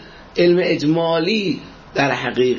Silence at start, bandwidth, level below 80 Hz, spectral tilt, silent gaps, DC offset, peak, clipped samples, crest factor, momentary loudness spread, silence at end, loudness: 0 s; 7.2 kHz; -52 dBFS; -6 dB/octave; none; under 0.1%; -2 dBFS; under 0.1%; 16 dB; 11 LU; 0 s; -18 LUFS